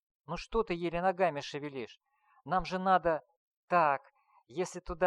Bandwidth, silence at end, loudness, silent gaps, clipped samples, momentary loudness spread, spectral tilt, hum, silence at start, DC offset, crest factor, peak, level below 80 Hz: 11 kHz; 0 s; -33 LUFS; 3.37-3.68 s; under 0.1%; 14 LU; -5.5 dB/octave; none; 0.3 s; under 0.1%; 20 dB; -14 dBFS; -54 dBFS